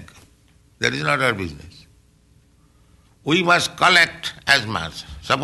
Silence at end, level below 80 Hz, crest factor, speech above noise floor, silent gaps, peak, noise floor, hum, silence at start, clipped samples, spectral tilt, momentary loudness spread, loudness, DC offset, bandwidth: 0 s; -50 dBFS; 20 dB; 36 dB; none; -2 dBFS; -55 dBFS; none; 0 s; under 0.1%; -3 dB/octave; 17 LU; -18 LUFS; under 0.1%; 12 kHz